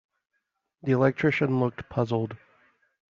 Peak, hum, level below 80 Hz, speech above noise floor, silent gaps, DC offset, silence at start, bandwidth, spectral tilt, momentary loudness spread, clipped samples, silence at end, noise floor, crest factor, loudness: -8 dBFS; none; -62 dBFS; 54 dB; none; under 0.1%; 0.85 s; 7.2 kHz; -6.5 dB/octave; 13 LU; under 0.1%; 0.75 s; -79 dBFS; 20 dB; -26 LUFS